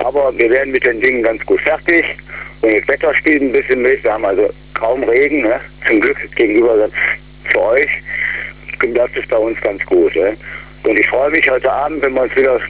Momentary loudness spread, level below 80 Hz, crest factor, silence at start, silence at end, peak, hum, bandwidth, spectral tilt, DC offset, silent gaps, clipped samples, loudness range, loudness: 7 LU; -40 dBFS; 12 dB; 0 s; 0 s; -2 dBFS; none; 4 kHz; -8 dB/octave; 0.3%; none; under 0.1%; 2 LU; -14 LUFS